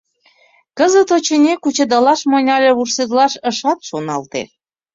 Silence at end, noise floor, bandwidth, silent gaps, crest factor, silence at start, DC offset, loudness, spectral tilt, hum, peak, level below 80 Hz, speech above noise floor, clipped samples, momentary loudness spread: 0.5 s; -54 dBFS; 7.8 kHz; none; 14 dB; 0.75 s; under 0.1%; -14 LUFS; -3 dB/octave; none; -2 dBFS; -62 dBFS; 40 dB; under 0.1%; 10 LU